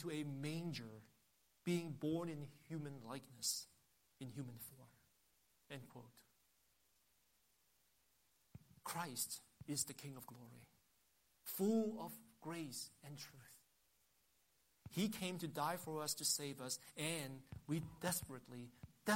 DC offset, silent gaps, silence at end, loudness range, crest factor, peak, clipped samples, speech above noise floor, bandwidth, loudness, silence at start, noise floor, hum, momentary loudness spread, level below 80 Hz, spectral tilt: under 0.1%; none; 0 s; 14 LU; 24 dB; -24 dBFS; under 0.1%; 34 dB; 16 kHz; -45 LUFS; 0 s; -79 dBFS; none; 18 LU; -78 dBFS; -4 dB/octave